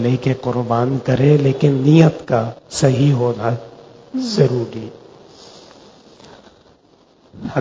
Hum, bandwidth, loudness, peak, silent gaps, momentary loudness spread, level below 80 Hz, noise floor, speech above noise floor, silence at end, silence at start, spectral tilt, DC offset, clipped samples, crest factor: none; 8 kHz; -16 LUFS; 0 dBFS; none; 15 LU; -50 dBFS; -52 dBFS; 37 dB; 0 s; 0 s; -7.5 dB/octave; under 0.1%; under 0.1%; 18 dB